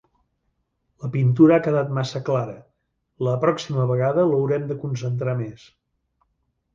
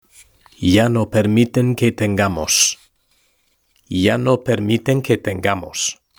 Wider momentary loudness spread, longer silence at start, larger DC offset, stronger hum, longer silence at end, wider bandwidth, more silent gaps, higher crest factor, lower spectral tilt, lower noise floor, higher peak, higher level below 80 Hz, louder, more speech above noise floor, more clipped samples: first, 13 LU vs 7 LU; first, 1 s vs 0.6 s; neither; neither; first, 1.2 s vs 0.25 s; second, 7.4 kHz vs over 20 kHz; neither; about the same, 18 dB vs 18 dB; first, -8 dB/octave vs -4.5 dB/octave; first, -73 dBFS vs -63 dBFS; second, -4 dBFS vs 0 dBFS; second, -60 dBFS vs -48 dBFS; second, -21 LUFS vs -17 LUFS; first, 52 dB vs 46 dB; neither